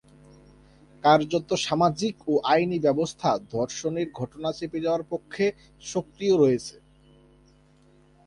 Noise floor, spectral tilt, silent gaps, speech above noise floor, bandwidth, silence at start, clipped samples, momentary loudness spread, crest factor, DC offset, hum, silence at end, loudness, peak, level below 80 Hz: -58 dBFS; -5 dB/octave; none; 33 dB; 11.5 kHz; 1.05 s; under 0.1%; 11 LU; 20 dB; under 0.1%; none; 1.55 s; -25 LUFS; -6 dBFS; -60 dBFS